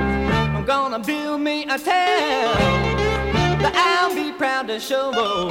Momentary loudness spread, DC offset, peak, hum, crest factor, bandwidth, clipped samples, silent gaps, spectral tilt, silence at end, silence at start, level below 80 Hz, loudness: 5 LU; under 0.1%; -4 dBFS; none; 16 dB; 17 kHz; under 0.1%; none; -5 dB/octave; 0 s; 0 s; -34 dBFS; -20 LUFS